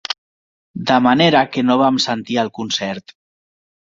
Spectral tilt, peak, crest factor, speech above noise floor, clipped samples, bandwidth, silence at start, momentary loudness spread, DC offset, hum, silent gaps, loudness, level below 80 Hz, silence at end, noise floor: -4.5 dB/octave; 0 dBFS; 18 dB; over 74 dB; under 0.1%; 7.6 kHz; 0.1 s; 14 LU; under 0.1%; none; 0.18-0.74 s; -16 LUFS; -58 dBFS; 1 s; under -90 dBFS